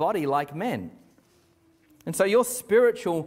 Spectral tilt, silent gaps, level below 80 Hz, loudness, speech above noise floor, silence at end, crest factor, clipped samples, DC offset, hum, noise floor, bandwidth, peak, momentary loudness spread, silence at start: -4.5 dB/octave; none; -68 dBFS; -24 LUFS; 38 dB; 0 s; 16 dB; under 0.1%; under 0.1%; none; -62 dBFS; 16 kHz; -10 dBFS; 14 LU; 0 s